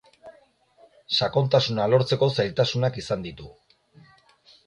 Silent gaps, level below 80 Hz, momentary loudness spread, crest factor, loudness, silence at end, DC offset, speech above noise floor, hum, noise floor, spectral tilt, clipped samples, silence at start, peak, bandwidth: none; -58 dBFS; 10 LU; 20 dB; -23 LUFS; 1.15 s; under 0.1%; 36 dB; none; -59 dBFS; -6 dB/octave; under 0.1%; 0.25 s; -6 dBFS; 10.5 kHz